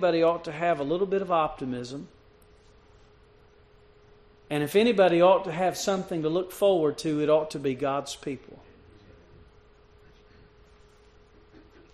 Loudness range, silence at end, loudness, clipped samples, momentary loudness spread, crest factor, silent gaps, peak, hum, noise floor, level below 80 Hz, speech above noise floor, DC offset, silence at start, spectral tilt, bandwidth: 13 LU; 3.4 s; -26 LUFS; under 0.1%; 14 LU; 20 dB; none; -8 dBFS; none; -57 dBFS; -60 dBFS; 32 dB; under 0.1%; 0 s; -5.5 dB/octave; 13 kHz